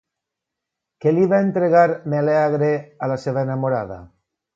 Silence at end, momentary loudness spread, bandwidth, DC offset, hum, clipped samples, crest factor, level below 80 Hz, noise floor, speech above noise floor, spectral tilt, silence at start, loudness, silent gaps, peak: 0.5 s; 9 LU; 7.6 kHz; under 0.1%; none; under 0.1%; 18 dB; -58 dBFS; -83 dBFS; 65 dB; -9 dB/octave; 1.05 s; -19 LUFS; none; -2 dBFS